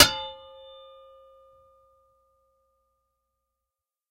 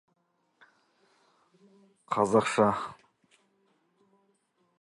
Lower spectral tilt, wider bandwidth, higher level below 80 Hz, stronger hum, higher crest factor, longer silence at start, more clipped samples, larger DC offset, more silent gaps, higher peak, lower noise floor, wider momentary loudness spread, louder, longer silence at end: second, -1 dB/octave vs -5.5 dB/octave; first, 15.5 kHz vs 11.5 kHz; first, -56 dBFS vs -70 dBFS; neither; first, 30 dB vs 24 dB; second, 0 s vs 2.1 s; neither; neither; neither; first, -2 dBFS vs -10 dBFS; first, -88 dBFS vs -72 dBFS; first, 25 LU vs 12 LU; first, -23 LUFS vs -27 LUFS; first, 3.75 s vs 1.85 s